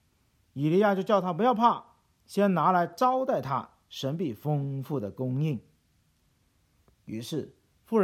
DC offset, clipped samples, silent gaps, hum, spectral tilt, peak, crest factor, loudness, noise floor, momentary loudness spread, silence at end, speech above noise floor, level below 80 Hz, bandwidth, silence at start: under 0.1%; under 0.1%; none; none; -7.5 dB/octave; -8 dBFS; 20 dB; -28 LUFS; -69 dBFS; 13 LU; 0 s; 42 dB; -72 dBFS; 16 kHz; 0.55 s